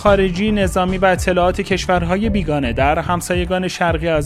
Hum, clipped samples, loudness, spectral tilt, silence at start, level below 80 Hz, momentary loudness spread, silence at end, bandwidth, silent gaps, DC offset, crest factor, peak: none; under 0.1%; -17 LUFS; -5.5 dB/octave; 0 s; -28 dBFS; 4 LU; 0 s; 14 kHz; none; under 0.1%; 16 dB; 0 dBFS